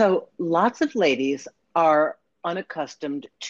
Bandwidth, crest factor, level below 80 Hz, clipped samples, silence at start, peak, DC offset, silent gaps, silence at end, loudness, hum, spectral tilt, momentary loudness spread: 7.8 kHz; 18 dB; -70 dBFS; under 0.1%; 0 s; -6 dBFS; under 0.1%; none; 0 s; -24 LUFS; none; -5 dB/octave; 12 LU